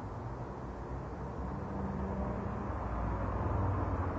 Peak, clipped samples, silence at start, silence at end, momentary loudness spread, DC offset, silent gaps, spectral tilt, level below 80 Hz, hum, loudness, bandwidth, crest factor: -22 dBFS; under 0.1%; 0 s; 0 s; 8 LU; under 0.1%; none; -9.5 dB/octave; -42 dBFS; none; -38 LUFS; 8 kHz; 14 dB